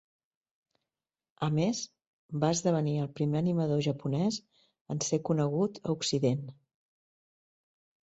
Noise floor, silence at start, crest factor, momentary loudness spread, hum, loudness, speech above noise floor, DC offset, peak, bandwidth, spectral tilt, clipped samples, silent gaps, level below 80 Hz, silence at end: under -90 dBFS; 1.4 s; 18 dB; 9 LU; none; -31 LUFS; over 60 dB; under 0.1%; -16 dBFS; 8.2 kHz; -6 dB/octave; under 0.1%; 2.07-2.29 s, 4.81-4.85 s; -68 dBFS; 1.65 s